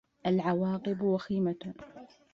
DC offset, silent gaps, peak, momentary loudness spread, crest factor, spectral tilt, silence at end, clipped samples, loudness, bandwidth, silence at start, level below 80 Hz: under 0.1%; none; -16 dBFS; 16 LU; 16 dB; -9 dB/octave; 0.25 s; under 0.1%; -31 LUFS; 6.6 kHz; 0.25 s; -66 dBFS